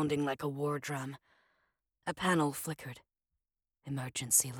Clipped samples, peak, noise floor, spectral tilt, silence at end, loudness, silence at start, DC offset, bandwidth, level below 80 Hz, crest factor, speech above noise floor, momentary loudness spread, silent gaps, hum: under 0.1%; -14 dBFS; -89 dBFS; -3.5 dB/octave; 0 s; -34 LUFS; 0 s; under 0.1%; 19 kHz; -70 dBFS; 22 dB; 55 dB; 19 LU; none; none